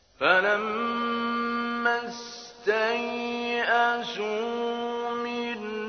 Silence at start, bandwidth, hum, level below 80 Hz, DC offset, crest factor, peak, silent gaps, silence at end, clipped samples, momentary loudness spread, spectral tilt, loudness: 0.2 s; 6.6 kHz; none; -68 dBFS; under 0.1%; 20 dB; -6 dBFS; none; 0 s; under 0.1%; 9 LU; -3.5 dB/octave; -27 LUFS